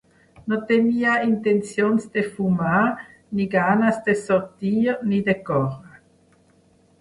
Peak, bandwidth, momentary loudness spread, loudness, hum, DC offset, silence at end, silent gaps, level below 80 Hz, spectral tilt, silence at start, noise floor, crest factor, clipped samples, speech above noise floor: -6 dBFS; 11.5 kHz; 8 LU; -21 LUFS; none; under 0.1%; 1.1 s; none; -58 dBFS; -7 dB/octave; 0.45 s; -58 dBFS; 16 dB; under 0.1%; 37 dB